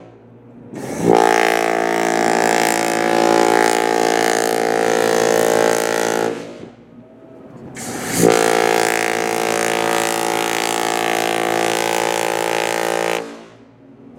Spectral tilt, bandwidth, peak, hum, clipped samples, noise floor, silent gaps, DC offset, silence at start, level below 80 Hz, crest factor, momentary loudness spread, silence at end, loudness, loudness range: -3 dB/octave; 17 kHz; 0 dBFS; none; under 0.1%; -44 dBFS; none; under 0.1%; 0 s; -56 dBFS; 18 dB; 10 LU; 0.1 s; -16 LUFS; 4 LU